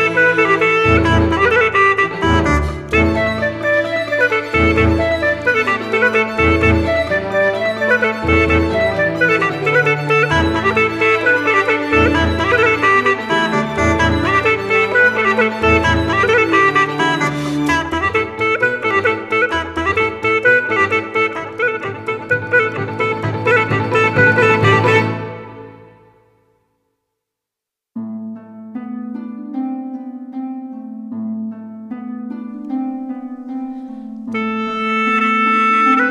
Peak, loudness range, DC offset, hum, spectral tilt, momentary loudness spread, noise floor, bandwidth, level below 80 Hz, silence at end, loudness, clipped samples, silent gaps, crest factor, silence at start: 0 dBFS; 14 LU; under 0.1%; none; -6 dB/octave; 16 LU; -84 dBFS; 13 kHz; -32 dBFS; 0 s; -14 LUFS; under 0.1%; none; 16 dB; 0 s